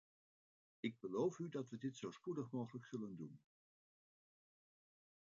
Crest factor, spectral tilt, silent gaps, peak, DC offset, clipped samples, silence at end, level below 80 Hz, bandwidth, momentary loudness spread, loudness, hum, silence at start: 20 dB; -6.5 dB/octave; none; -28 dBFS; under 0.1%; under 0.1%; 1.85 s; under -90 dBFS; 7.4 kHz; 10 LU; -47 LUFS; none; 0.85 s